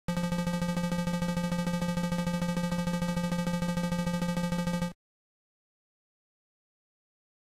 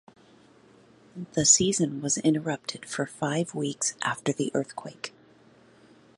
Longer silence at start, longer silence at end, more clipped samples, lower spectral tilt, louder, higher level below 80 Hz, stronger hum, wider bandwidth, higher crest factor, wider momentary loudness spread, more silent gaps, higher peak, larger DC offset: second, 0.1 s vs 1.15 s; first, 2.6 s vs 1.1 s; neither; first, -6 dB/octave vs -3 dB/octave; second, -31 LUFS vs -26 LUFS; first, -48 dBFS vs -64 dBFS; neither; first, 15 kHz vs 11.5 kHz; second, 12 dB vs 22 dB; second, 0 LU vs 19 LU; neither; second, -20 dBFS vs -6 dBFS; neither